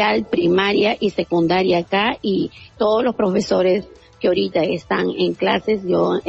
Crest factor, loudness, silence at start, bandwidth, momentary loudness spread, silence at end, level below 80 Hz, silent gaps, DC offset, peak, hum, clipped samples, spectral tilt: 14 dB; -19 LUFS; 0 s; 8 kHz; 5 LU; 0 s; -52 dBFS; none; under 0.1%; -4 dBFS; none; under 0.1%; -6 dB/octave